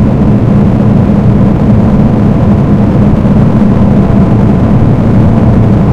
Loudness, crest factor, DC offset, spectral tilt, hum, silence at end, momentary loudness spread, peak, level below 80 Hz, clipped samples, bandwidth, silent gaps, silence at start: -7 LUFS; 6 dB; under 0.1%; -10.5 dB/octave; none; 0 s; 1 LU; 0 dBFS; -18 dBFS; 5%; 6.6 kHz; none; 0 s